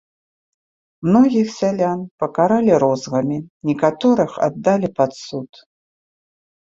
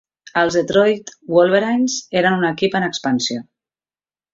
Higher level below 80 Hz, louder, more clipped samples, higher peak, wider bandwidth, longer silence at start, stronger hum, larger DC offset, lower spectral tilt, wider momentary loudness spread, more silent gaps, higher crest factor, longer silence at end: about the same, -58 dBFS vs -58 dBFS; about the same, -18 LUFS vs -17 LUFS; neither; about the same, -2 dBFS vs -2 dBFS; about the same, 7.8 kHz vs 7.8 kHz; first, 1 s vs 0.25 s; neither; neither; first, -7 dB/octave vs -4.5 dB/octave; about the same, 10 LU vs 8 LU; first, 2.11-2.18 s, 3.50-3.60 s vs none; about the same, 18 dB vs 16 dB; first, 1.3 s vs 0.9 s